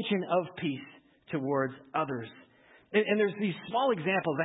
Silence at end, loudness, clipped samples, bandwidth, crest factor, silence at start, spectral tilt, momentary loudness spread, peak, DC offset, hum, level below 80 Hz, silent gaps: 0 s; -31 LUFS; under 0.1%; 4 kHz; 18 dB; 0 s; -10 dB/octave; 11 LU; -12 dBFS; under 0.1%; none; -74 dBFS; none